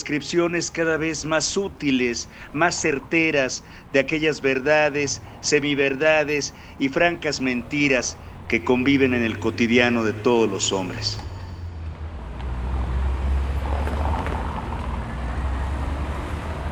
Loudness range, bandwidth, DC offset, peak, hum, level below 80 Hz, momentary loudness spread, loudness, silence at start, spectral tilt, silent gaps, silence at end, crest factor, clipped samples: 7 LU; 11.5 kHz; under 0.1%; -4 dBFS; none; -32 dBFS; 12 LU; -22 LUFS; 0 s; -4.5 dB/octave; none; 0 s; 20 dB; under 0.1%